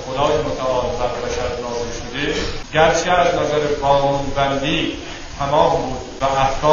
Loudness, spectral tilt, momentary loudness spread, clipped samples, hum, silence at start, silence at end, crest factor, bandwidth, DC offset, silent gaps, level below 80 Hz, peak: -19 LUFS; -4.5 dB/octave; 9 LU; under 0.1%; none; 0 s; 0 s; 18 dB; 7.6 kHz; under 0.1%; none; -32 dBFS; 0 dBFS